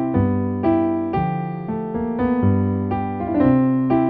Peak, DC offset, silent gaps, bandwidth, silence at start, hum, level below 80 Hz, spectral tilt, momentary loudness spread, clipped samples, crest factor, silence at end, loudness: -6 dBFS; under 0.1%; none; 4.5 kHz; 0 s; none; -42 dBFS; -12.5 dB/octave; 8 LU; under 0.1%; 14 dB; 0 s; -20 LUFS